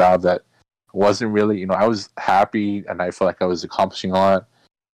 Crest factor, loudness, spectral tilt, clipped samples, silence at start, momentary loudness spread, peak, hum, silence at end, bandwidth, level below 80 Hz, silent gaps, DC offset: 12 dB; -19 LUFS; -6 dB/octave; under 0.1%; 0 s; 7 LU; -8 dBFS; none; 0.5 s; 12 kHz; -60 dBFS; none; under 0.1%